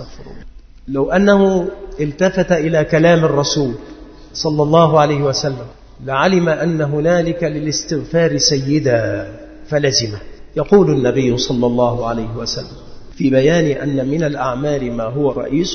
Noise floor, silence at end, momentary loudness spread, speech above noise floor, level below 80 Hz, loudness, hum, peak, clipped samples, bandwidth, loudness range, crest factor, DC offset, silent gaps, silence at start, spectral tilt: -35 dBFS; 0 s; 12 LU; 20 dB; -38 dBFS; -16 LUFS; none; 0 dBFS; under 0.1%; 6.6 kHz; 3 LU; 16 dB; under 0.1%; none; 0 s; -5.5 dB/octave